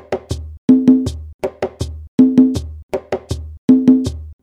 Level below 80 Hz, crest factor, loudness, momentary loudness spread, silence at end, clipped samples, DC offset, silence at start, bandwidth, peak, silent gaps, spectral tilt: -34 dBFS; 16 dB; -15 LUFS; 15 LU; 0.1 s; under 0.1%; under 0.1%; 0.1 s; 10.5 kHz; 0 dBFS; 0.58-0.68 s, 1.34-1.39 s, 2.08-2.18 s, 2.83-2.89 s, 3.58-3.68 s; -7.5 dB/octave